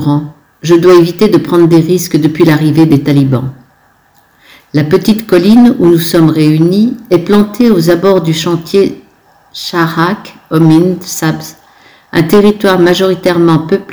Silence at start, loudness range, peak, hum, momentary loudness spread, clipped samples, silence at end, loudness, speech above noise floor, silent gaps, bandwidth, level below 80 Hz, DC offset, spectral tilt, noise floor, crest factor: 0 s; 4 LU; 0 dBFS; none; 9 LU; 5%; 0 s; -8 LUFS; 40 dB; none; over 20 kHz; -42 dBFS; under 0.1%; -6.5 dB/octave; -48 dBFS; 8 dB